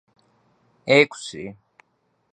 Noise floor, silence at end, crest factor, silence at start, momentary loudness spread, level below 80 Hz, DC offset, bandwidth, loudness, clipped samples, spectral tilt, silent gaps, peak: -69 dBFS; 0.8 s; 24 dB; 0.85 s; 20 LU; -68 dBFS; under 0.1%; 9.6 kHz; -19 LUFS; under 0.1%; -4.5 dB/octave; none; -2 dBFS